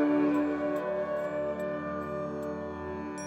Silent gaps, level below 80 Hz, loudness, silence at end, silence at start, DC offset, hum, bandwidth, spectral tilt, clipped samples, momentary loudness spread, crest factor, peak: none; -60 dBFS; -32 LUFS; 0 s; 0 s; under 0.1%; none; 11 kHz; -7 dB/octave; under 0.1%; 10 LU; 14 dB; -16 dBFS